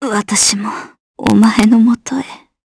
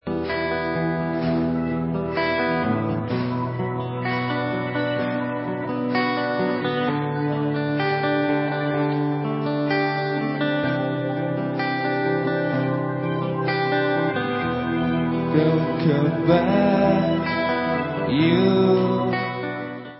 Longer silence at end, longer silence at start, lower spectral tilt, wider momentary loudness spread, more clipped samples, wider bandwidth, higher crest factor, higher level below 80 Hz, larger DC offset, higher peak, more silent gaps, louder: first, 0.3 s vs 0 s; about the same, 0 s vs 0.05 s; second, -3.5 dB/octave vs -11.5 dB/octave; first, 14 LU vs 6 LU; neither; first, 11 kHz vs 5.8 kHz; about the same, 14 dB vs 18 dB; about the same, -46 dBFS vs -50 dBFS; neither; first, 0 dBFS vs -4 dBFS; first, 1.00-1.14 s vs none; first, -12 LUFS vs -22 LUFS